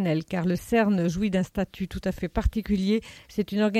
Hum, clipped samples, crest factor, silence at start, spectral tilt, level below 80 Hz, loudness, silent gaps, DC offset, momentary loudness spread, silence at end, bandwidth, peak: none; under 0.1%; 14 dB; 0 s; -7 dB/octave; -38 dBFS; -27 LUFS; none; under 0.1%; 8 LU; 0 s; 15 kHz; -10 dBFS